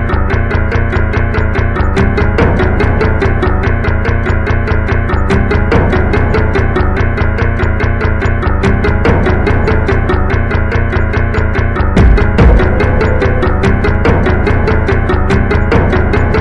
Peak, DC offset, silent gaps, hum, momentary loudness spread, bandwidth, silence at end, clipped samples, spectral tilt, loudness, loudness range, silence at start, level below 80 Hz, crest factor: 0 dBFS; 0.7%; none; none; 3 LU; 7.4 kHz; 0 s; under 0.1%; -8 dB/octave; -12 LUFS; 2 LU; 0 s; -14 dBFS; 10 dB